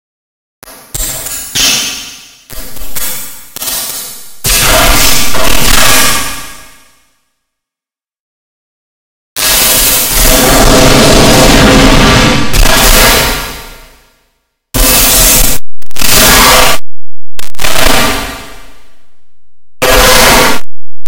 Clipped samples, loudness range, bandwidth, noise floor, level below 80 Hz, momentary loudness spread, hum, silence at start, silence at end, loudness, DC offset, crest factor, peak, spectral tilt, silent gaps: 10%; 9 LU; over 20 kHz; -88 dBFS; -16 dBFS; 18 LU; none; 0.6 s; 0 s; -6 LUFS; under 0.1%; 6 dB; 0 dBFS; -2.5 dB/octave; 8.20-9.36 s